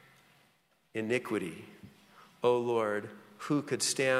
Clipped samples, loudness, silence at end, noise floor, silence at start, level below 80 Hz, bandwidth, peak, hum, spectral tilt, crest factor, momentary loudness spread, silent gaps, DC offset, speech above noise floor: under 0.1%; -32 LUFS; 0 s; -70 dBFS; 0.95 s; -78 dBFS; 15.5 kHz; -14 dBFS; none; -3.5 dB/octave; 18 dB; 17 LU; none; under 0.1%; 39 dB